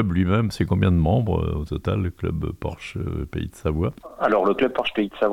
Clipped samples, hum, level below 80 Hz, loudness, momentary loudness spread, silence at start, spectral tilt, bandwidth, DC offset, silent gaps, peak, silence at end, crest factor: under 0.1%; none; -38 dBFS; -23 LUFS; 10 LU; 0 s; -8 dB/octave; 13.5 kHz; under 0.1%; none; -6 dBFS; 0 s; 16 dB